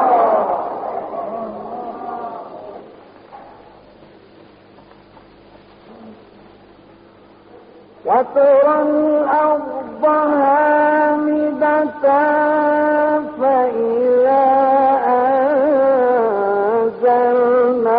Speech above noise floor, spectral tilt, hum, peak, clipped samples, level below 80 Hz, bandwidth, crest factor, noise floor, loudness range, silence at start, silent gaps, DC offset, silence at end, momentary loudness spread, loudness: 32 dB; -4.5 dB/octave; 50 Hz at -60 dBFS; -2 dBFS; under 0.1%; -60 dBFS; 5 kHz; 14 dB; -45 dBFS; 16 LU; 0 s; none; under 0.1%; 0 s; 14 LU; -15 LUFS